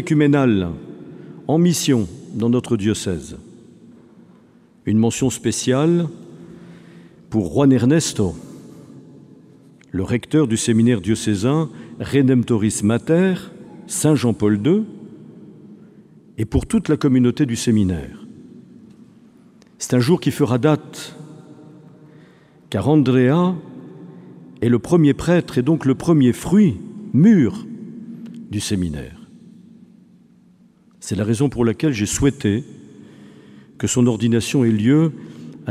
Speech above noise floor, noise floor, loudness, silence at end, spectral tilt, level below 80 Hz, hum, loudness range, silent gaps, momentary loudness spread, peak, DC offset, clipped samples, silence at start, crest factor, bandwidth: 35 dB; -52 dBFS; -18 LUFS; 0 s; -6 dB/octave; -44 dBFS; none; 5 LU; none; 20 LU; -2 dBFS; under 0.1%; under 0.1%; 0 s; 18 dB; 15 kHz